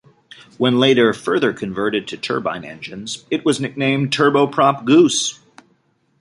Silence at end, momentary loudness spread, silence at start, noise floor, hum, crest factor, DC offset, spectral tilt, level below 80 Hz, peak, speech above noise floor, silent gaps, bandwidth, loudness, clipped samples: 0.85 s; 13 LU; 0.6 s; -62 dBFS; none; 16 dB; under 0.1%; -4.5 dB/octave; -60 dBFS; -2 dBFS; 44 dB; none; 11.5 kHz; -17 LUFS; under 0.1%